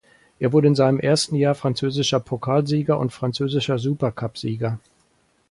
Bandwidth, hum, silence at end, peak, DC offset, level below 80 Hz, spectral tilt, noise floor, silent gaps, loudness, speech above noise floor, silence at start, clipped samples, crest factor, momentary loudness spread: 11.5 kHz; none; 0.7 s; -4 dBFS; under 0.1%; -56 dBFS; -6 dB/octave; -63 dBFS; none; -21 LUFS; 43 dB; 0.4 s; under 0.1%; 16 dB; 9 LU